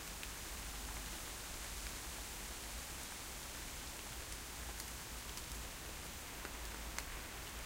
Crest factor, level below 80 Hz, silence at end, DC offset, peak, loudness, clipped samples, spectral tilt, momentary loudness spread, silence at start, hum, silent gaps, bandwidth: 28 dB; -52 dBFS; 0 s; under 0.1%; -20 dBFS; -46 LUFS; under 0.1%; -2 dB/octave; 2 LU; 0 s; none; none; 16 kHz